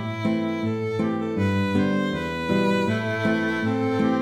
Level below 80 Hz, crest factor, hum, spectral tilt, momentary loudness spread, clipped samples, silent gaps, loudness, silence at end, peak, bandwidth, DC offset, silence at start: -56 dBFS; 14 dB; none; -7 dB/octave; 4 LU; under 0.1%; none; -24 LUFS; 0 s; -10 dBFS; 13 kHz; 0.1%; 0 s